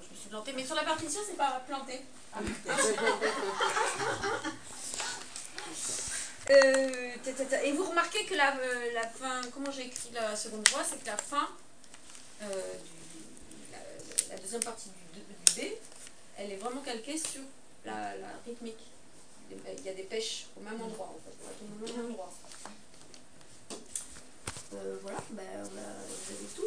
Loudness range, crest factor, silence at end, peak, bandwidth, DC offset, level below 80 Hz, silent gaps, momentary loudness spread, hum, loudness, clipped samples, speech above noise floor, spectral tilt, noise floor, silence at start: 14 LU; 34 dB; 0 s; 0 dBFS; 11 kHz; 0.3%; -66 dBFS; none; 21 LU; none; -33 LUFS; under 0.1%; 23 dB; -1.5 dB/octave; -57 dBFS; 0 s